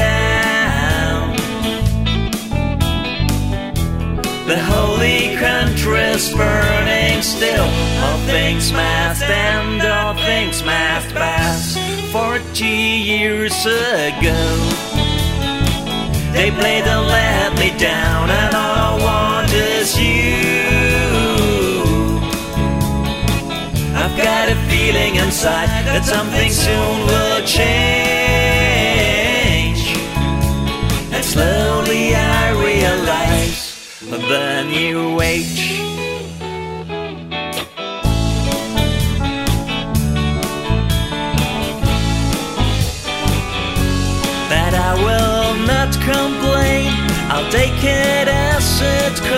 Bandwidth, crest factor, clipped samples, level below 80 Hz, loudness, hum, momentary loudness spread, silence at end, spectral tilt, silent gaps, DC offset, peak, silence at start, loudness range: 16.5 kHz; 14 dB; under 0.1%; -24 dBFS; -16 LUFS; none; 6 LU; 0 s; -4.5 dB/octave; none; under 0.1%; -2 dBFS; 0 s; 4 LU